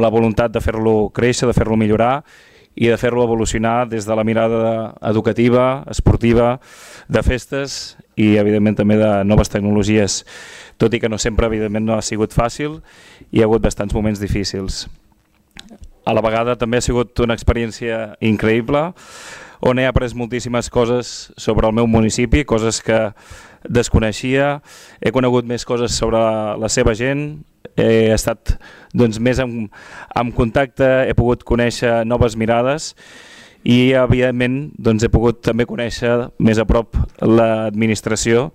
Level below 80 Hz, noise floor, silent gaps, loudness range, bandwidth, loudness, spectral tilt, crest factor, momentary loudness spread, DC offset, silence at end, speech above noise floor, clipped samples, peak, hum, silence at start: -30 dBFS; -56 dBFS; none; 3 LU; 15 kHz; -17 LUFS; -5.5 dB/octave; 14 dB; 10 LU; under 0.1%; 0.05 s; 40 dB; under 0.1%; -4 dBFS; none; 0 s